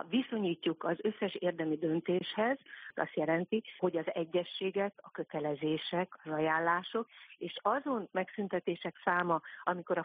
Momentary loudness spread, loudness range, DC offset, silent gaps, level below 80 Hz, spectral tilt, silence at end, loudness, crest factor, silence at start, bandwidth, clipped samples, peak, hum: 7 LU; 1 LU; under 0.1%; none; -82 dBFS; -4 dB/octave; 0 s; -35 LUFS; 20 dB; 0 s; 4.9 kHz; under 0.1%; -14 dBFS; none